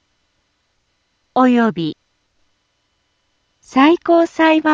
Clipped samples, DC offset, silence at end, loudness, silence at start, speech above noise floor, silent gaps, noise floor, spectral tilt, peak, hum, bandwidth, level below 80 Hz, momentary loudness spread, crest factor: under 0.1%; under 0.1%; 0 s; -15 LUFS; 1.35 s; 53 dB; none; -66 dBFS; -6 dB/octave; 0 dBFS; none; 7.6 kHz; -64 dBFS; 12 LU; 16 dB